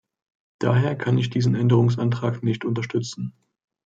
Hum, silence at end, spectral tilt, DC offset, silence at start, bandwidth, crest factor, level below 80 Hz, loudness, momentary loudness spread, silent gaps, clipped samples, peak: none; 0.55 s; -7.5 dB/octave; under 0.1%; 0.6 s; 7.6 kHz; 18 dB; -62 dBFS; -22 LUFS; 9 LU; none; under 0.1%; -4 dBFS